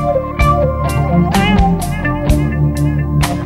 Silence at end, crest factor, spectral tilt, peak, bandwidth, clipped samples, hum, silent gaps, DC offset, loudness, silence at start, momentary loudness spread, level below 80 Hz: 0 s; 12 dB; -6.5 dB/octave; 0 dBFS; 15.5 kHz; under 0.1%; none; none; under 0.1%; -14 LUFS; 0 s; 5 LU; -20 dBFS